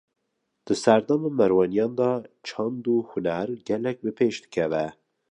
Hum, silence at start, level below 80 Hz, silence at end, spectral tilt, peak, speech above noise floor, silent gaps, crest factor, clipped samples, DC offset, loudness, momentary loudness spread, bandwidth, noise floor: none; 0.65 s; -64 dBFS; 0.4 s; -6 dB/octave; -4 dBFS; 53 dB; none; 20 dB; under 0.1%; under 0.1%; -25 LUFS; 9 LU; 10.5 kHz; -77 dBFS